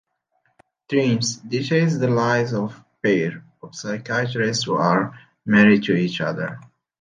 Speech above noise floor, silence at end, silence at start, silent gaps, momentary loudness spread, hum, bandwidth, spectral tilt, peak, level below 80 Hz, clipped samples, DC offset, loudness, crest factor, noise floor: 49 dB; 0.35 s; 0.9 s; none; 15 LU; none; 9.6 kHz; -5.5 dB/octave; -2 dBFS; -62 dBFS; under 0.1%; under 0.1%; -21 LUFS; 20 dB; -68 dBFS